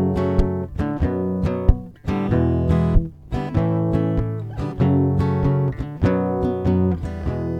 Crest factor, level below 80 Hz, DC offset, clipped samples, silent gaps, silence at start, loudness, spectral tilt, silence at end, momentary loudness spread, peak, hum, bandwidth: 20 dB; -28 dBFS; under 0.1%; under 0.1%; none; 0 s; -21 LUFS; -10 dB/octave; 0 s; 7 LU; 0 dBFS; none; 7.6 kHz